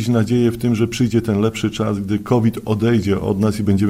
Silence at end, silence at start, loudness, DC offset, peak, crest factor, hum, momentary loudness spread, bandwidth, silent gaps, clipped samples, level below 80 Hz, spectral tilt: 0 s; 0 s; -18 LUFS; under 0.1%; -2 dBFS; 14 dB; none; 3 LU; 15.5 kHz; none; under 0.1%; -44 dBFS; -7 dB/octave